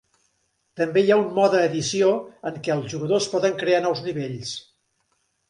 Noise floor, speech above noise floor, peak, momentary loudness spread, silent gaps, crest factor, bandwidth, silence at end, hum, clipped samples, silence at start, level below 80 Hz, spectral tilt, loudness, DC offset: -70 dBFS; 49 dB; -6 dBFS; 11 LU; none; 18 dB; 11 kHz; 0.9 s; none; under 0.1%; 0.75 s; -66 dBFS; -4.5 dB/octave; -22 LUFS; under 0.1%